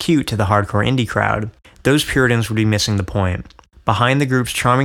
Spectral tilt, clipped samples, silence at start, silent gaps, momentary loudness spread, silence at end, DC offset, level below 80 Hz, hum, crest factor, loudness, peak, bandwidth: -5.5 dB/octave; under 0.1%; 0 s; none; 7 LU; 0 s; under 0.1%; -38 dBFS; none; 16 dB; -17 LUFS; 0 dBFS; 17 kHz